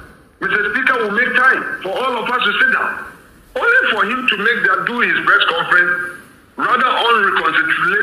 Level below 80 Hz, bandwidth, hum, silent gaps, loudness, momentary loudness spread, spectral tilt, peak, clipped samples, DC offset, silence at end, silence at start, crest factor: -54 dBFS; 15 kHz; none; none; -14 LUFS; 9 LU; -3.5 dB/octave; 0 dBFS; under 0.1%; under 0.1%; 0 s; 0 s; 16 dB